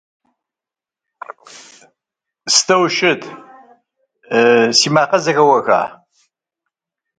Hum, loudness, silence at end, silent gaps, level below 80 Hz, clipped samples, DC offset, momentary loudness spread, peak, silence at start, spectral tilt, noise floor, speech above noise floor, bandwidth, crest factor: none; -13 LUFS; 1.3 s; none; -66 dBFS; under 0.1%; under 0.1%; 22 LU; 0 dBFS; 1.3 s; -2.5 dB/octave; -88 dBFS; 75 dB; 9.6 kHz; 18 dB